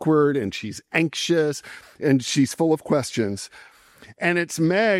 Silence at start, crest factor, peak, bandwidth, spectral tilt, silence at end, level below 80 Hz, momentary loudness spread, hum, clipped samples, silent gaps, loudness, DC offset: 0 s; 18 dB; -6 dBFS; 16 kHz; -5 dB/octave; 0 s; -64 dBFS; 12 LU; none; under 0.1%; none; -22 LUFS; under 0.1%